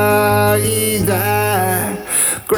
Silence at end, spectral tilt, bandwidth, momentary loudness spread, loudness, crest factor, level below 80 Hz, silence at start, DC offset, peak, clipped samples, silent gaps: 0 s; -4 dB/octave; over 20 kHz; 4 LU; -15 LUFS; 12 dB; -42 dBFS; 0 s; under 0.1%; -2 dBFS; under 0.1%; none